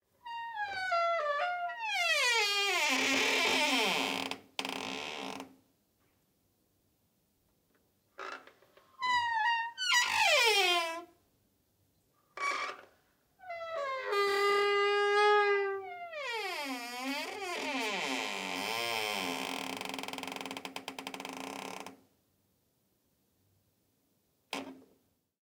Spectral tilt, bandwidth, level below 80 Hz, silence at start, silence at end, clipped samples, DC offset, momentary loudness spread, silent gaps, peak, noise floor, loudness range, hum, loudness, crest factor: -1 dB/octave; 18 kHz; -82 dBFS; 0.25 s; 0.6 s; under 0.1%; under 0.1%; 16 LU; none; -14 dBFS; -75 dBFS; 18 LU; none; -31 LUFS; 22 dB